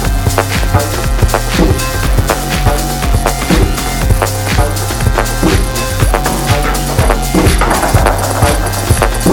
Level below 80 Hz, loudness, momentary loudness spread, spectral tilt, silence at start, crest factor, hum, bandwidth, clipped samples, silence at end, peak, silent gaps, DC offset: -16 dBFS; -12 LUFS; 3 LU; -4.5 dB/octave; 0 s; 10 dB; none; 18 kHz; 0.2%; 0 s; 0 dBFS; none; under 0.1%